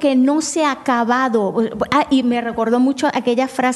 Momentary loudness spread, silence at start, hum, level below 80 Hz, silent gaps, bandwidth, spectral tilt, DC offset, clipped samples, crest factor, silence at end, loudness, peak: 4 LU; 0 s; none; -54 dBFS; none; 12 kHz; -4 dB/octave; under 0.1%; under 0.1%; 14 dB; 0 s; -17 LUFS; -2 dBFS